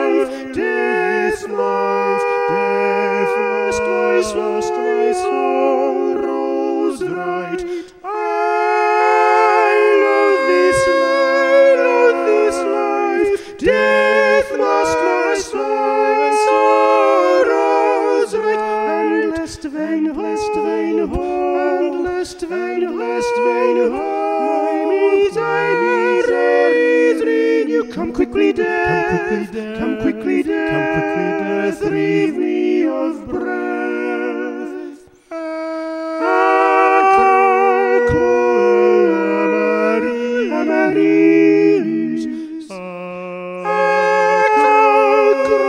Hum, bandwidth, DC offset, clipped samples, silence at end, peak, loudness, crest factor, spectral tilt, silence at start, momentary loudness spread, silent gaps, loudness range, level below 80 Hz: none; 11.5 kHz; under 0.1%; under 0.1%; 0 s; -2 dBFS; -16 LUFS; 14 dB; -5 dB/octave; 0 s; 10 LU; none; 6 LU; -46 dBFS